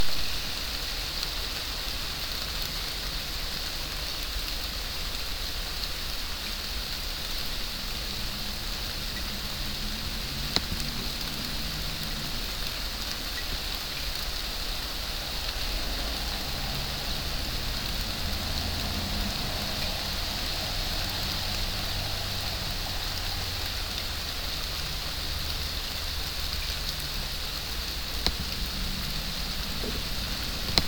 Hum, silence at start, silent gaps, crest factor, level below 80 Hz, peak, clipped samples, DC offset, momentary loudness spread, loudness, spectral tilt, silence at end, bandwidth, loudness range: none; 0 s; none; 30 dB; -36 dBFS; 0 dBFS; under 0.1%; under 0.1%; 2 LU; -31 LUFS; -2.5 dB/octave; 0 s; 19 kHz; 2 LU